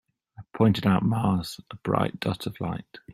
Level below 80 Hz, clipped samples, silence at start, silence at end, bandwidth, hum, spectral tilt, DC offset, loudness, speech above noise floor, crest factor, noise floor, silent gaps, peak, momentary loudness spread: -56 dBFS; under 0.1%; 0.4 s; 0 s; 14.5 kHz; none; -7 dB/octave; under 0.1%; -26 LUFS; 24 dB; 20 dB; -49 dBFS; none; -6 dBFS; 14 LU